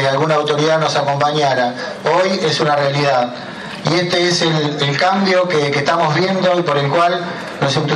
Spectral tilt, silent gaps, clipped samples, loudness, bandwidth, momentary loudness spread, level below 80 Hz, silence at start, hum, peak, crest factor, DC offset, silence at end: -5 dB/octave; none; under 0.1%; -15 LUFS; 11.5 kHz; 6 LU; -58 dBFS; 0 s; none; 0 dBFS; 16 dB; under 0.1%; 0 s